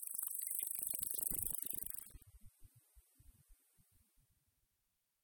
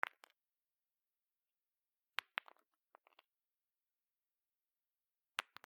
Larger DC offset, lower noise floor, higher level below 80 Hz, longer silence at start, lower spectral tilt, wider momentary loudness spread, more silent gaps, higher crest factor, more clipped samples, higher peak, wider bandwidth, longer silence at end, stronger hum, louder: neither; second, -85 dBFS vs under -90 dBFS; first, -66 dBFS vs under -90 dBFS; second, 0 s vs 5.4 s; first, -1 dB/octave vs 0.5 dB/octave; second, 8 LU vs 21 LU; neither; second, 26 dB vs 38 dB; neither; second, -20 dBFS vs -16 dBFS; first, 19.5 kHz vs 16.5 kHz; first, 1.7 s vs 0.25 s; neither; first, -40 LUFS vs -47 LUFS